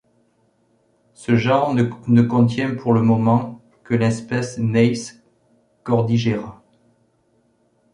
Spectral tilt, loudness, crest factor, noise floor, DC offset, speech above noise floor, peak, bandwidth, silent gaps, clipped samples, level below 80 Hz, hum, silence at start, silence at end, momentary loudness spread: -7.5 dB/octave; -19 LUFS; 18 dB; -62 dBFS; under 0.1%; 45 dB; -2 dBFS; 10.5 kHz; none; under 0.1%; -56 dBFS; none; 1.2 s; 1.4 s; 12 LU